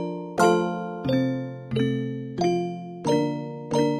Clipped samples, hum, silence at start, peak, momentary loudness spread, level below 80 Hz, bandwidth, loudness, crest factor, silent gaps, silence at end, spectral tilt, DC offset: under 0.1%; none; 0 s; -6 dBFS; 10 LU; -58 dBFS; 13.5 kHz; -26 LUFS; 18 dB; none; 0 s; -6.5 dB/octave; under 0.1%